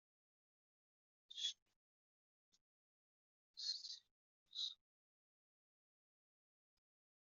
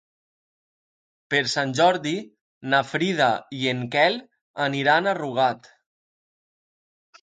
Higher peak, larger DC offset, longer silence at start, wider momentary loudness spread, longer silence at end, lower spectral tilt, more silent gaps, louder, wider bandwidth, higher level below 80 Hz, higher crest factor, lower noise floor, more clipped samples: second, -30 dBFS vs -4 dBFS; neither; about the same, 1.3 s vs 1.3 s; first, 16 LU vs 11 LU; first, 2.55 s vs 1.65 s; second, 6.5 dB/octave vs -4.5 dB/octave; first, 1.62-1.66 s, 1.76-2.52 s, 2.61-3.54 s, 4.11-4.46 s vs 2.41-2.61 s, 4.41-4.54 s; second, -47 LUFS vs -23 LUFS; second, 7.4 kHz vs 9.4 kHz; second, under -90 dBFS vs -70 dBFS; about the same, 26 dB vs 22 dB; about the same, under -90 dBFS vs under -90 dBFS; neither